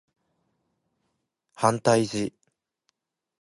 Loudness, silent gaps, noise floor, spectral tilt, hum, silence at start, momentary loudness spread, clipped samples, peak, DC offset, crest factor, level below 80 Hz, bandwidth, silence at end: -25 LUFS; none; -78 dBFS; -5 dB/octave; none; 1.6 s; 10 LU; under 0.1%; -4 dBFS; under 0.1%; 26 dB; -66 dBFS; 11.5 kHz; 1.1 s